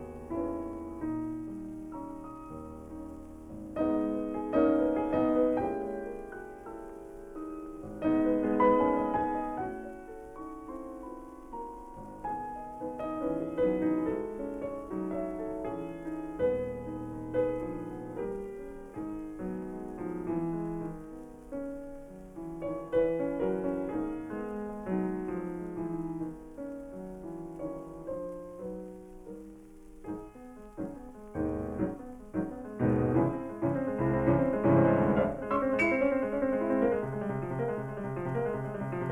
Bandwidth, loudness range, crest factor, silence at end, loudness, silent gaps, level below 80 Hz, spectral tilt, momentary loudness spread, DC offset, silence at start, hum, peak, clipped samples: 11.5 kHz; 13 LU; 20 dB; 0 s; -33 LUFS; none; -52 dBFS; -9 dB/octave; 17 LU; under 0.1%; 0 s; none; -12 dBFS; under 0.1%